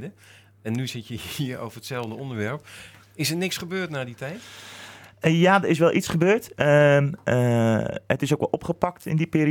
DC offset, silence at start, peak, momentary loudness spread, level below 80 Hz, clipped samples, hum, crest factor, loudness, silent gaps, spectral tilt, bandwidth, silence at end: under 0.1%; 0 s; -4 dBFS; 20 LU; -58 dBFS; under 0.1%; none; 20 dB; -23 LUFS; none; -6 dB/octave; 19 kHz; 0 s